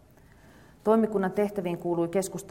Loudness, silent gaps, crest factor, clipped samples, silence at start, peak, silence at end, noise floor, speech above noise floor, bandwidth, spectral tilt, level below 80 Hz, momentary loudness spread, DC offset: -27 LUFS; none; 18 dB; under 0.1%; 0.85 s; -10 dBFS; 0 s; -55 dBFS; 29 dB; 16.5 kHz; -6.5 dB/octave; -60 dBFS; 7 LU; under 0.1%